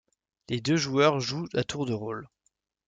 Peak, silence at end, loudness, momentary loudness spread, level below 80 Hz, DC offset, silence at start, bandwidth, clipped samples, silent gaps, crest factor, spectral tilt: -8 dBFS; 0.6 s; -28 LUFS; 12 LU; -62 dBFS; under 0.1%; 0.5 s; 9.4 kHz; under 0.1%; none; 22 dB; -5 dB/octave